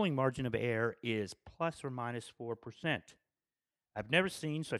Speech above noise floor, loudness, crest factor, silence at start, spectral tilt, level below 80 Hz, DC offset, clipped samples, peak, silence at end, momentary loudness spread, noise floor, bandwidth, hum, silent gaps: over 54 dB; -37 LUFS; 24 dB; 0 s; -5.5 dB/octave; -68 dBFS; under 0.1%; under 0.1%; -14 dBFS; 0 s; 12 LU; under -90 dBFS; 13.5 kHz; none; none